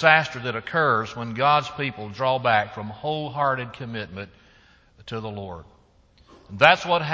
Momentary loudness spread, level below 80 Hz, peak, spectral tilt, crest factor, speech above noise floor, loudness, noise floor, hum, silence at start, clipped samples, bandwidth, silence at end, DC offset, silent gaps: 18 LU; -56 dBFS; 0 dBFS; -5 dB/octave; 24 dB; 34 dB; -23 LUFS; -57 dBFS; none; 0 s; under 0.1%; 8 kHz; 0 s; under 0.1%; none